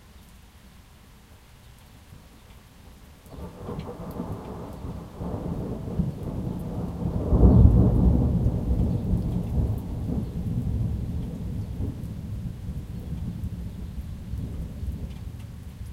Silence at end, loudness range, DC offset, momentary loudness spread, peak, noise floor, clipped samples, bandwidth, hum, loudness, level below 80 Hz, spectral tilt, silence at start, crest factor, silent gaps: 0 s; 17 LU; under 0.1%; 17 LU; -2 dBFS; -51 dBFS; under 0.1%; 13.5 kHz; none; -27 LUFS; -30 dBFS; -9.5 dB/octave; 0.05 s; 24 dB; none